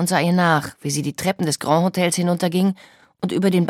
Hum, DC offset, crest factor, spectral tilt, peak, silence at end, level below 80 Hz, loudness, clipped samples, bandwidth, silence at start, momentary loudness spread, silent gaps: none; under 0.1%; 16 dB; -5 dB/octave; -4 dBFS; 0 s; -62 dBFS; -20 LUFS; under 0.1%; 16 kHz; 0 s; 8 LU; none